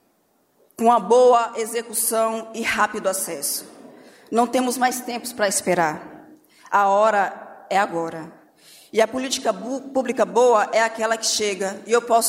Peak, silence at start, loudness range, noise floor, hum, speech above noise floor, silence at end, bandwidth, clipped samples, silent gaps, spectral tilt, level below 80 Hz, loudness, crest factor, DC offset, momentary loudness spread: -6 dBFS; 0.8 s; 3 LU; -64 dBFS; none; 44 dB; 0 s; 16 kHz; under 0.1%; none; -2.5 dB/octave; -66 dBFS; -21 LUFS; 16 dB; under 0.1%; 11 LU